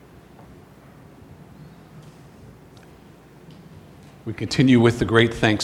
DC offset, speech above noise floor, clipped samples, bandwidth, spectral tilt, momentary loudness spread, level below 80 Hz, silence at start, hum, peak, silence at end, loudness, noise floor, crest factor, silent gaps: under 0.1%; 29 dB; under 0.1%; 13 kHz; -6 dB/octave; 18 LU; -50 dBFS; 1.6 s; none; -2 dBFS; 0 s; -18 LUFS; -47 dBFS; 22 dB; none